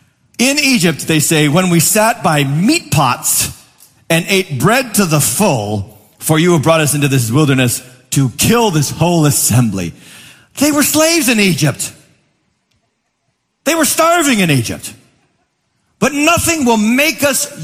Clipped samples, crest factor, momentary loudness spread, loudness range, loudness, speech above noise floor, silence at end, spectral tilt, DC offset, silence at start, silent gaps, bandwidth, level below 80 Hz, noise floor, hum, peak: under 0.1%; 14 dB; 10 LU; 3 LU; -12 LUFS; 54 dB; 0 s; -4 dB/octave; under 0.1%; 0.4 s; none; 15.5 kHz; -46 dBFS; -66 dBFS; none; 0 dBFS